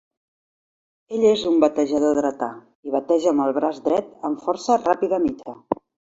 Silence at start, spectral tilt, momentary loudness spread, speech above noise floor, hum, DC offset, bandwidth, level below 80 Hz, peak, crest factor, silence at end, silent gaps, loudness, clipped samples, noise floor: 1.1 s; -5 dB/octave; 11 LU; over 70 dB; none; under 0.1%; 8 kHz; -60 dBFS; -2 dBFS; 20 dB; 0.4 s; 2.75-2.83 s; -21 LUFS; under 0.1%; under -90 dBFS